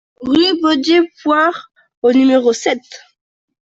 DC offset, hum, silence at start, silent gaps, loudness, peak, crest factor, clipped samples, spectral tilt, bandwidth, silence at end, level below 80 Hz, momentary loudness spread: under 0.1%; none; 0.2 s; 1.97-2.02 s; -14 LUFS; -2 dBFS; 12 dB; under 0.1%; -3 dB/octave; 8 kHz; 0.7 s; -56 dBFS; 7 LU